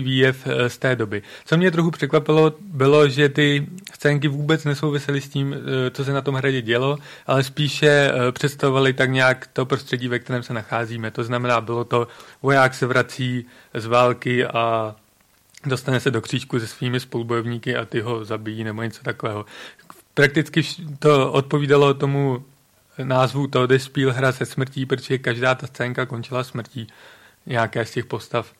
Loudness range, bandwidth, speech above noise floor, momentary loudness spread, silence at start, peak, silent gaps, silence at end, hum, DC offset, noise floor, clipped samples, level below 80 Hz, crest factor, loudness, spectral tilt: 6 LU; 14.5 kHz; 38 dB; 11 LU; 0 s; -4 dBFS; none; 0.15 s; none; under 0.1%; -58 dBFS; under 0.1%; -60 dBFS; 18 dB; -21 LUFS; -6 dB/octave